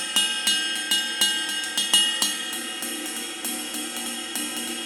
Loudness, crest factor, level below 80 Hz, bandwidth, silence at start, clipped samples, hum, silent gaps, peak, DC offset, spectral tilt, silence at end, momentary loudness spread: -23 LUFS; 22 dB; -70 dBFS; over 20 kHz; 0 s; under 0.1%; none; none; -4 dBFS; under 0.1%; 1 dB/octave; 0 s; 10 LU